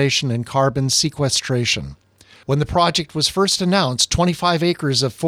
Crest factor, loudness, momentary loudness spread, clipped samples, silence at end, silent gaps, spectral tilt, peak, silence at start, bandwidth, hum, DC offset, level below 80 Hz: 16 dB; -18 LUFS; 5 LU; under 0.1%; 0 s; none; -4 dB/octave; -2 dBFS; 0 s; 15.5 kHz; none; under 0.1%; -42 dBFS